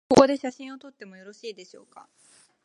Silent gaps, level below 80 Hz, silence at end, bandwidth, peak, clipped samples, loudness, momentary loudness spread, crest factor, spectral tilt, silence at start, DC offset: none; -60 dBFS; 1 s; 11 kHz; -2 dBFS; under 0.1%; -21 LUFS; 27 LU; 24 dB; -5 dB/octave; 0.1 s; under 0.1%